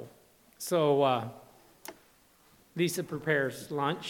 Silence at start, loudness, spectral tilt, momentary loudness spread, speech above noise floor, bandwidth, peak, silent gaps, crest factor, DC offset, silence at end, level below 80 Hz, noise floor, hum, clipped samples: 0 s; -30 LUFS; -5 dB/octave; 22 LU; 34 dB; 19 kHz; -14 dBFS; none; 18 dB; under 0.1%; 0 s; -72 dBFS; -63 dBFS; none; under 0.1%